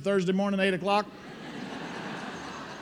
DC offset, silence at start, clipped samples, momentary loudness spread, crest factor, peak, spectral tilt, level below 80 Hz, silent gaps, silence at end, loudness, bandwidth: under 0.1%; 0 s; under 0.1%; 14 LU; 20 dB; -10 dBFS; -6 dB/octave; -66 dBFS; none; 0 s; -30 LUFS; 11.5 kHz